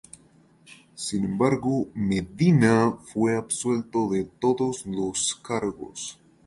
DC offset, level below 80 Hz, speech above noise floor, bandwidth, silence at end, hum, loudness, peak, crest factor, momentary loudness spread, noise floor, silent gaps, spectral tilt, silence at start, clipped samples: under 0.1%; -56 dBFS; 33 dB; 11.5 kHz; 0.35 s; none; -25 LUFS; -6 dBFS; 20 dB; 12 LU; -57 dBFS; none; -5.5 dB/octave; 0.7 s; under 0.1%